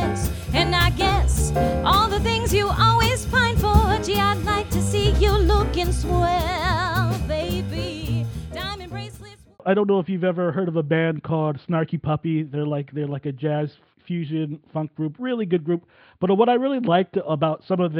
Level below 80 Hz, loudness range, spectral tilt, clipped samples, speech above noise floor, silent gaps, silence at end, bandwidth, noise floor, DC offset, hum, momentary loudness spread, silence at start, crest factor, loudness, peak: -30 dBFS; 7 LU; -5.5 dB/octave; under 0.1%; 22 dB; none; 0 s; 20 kHz; -44 dBFS; under 0.1%; none; 10 LU; 0 s; 18 dB; -22 LUFS; -4 dBFS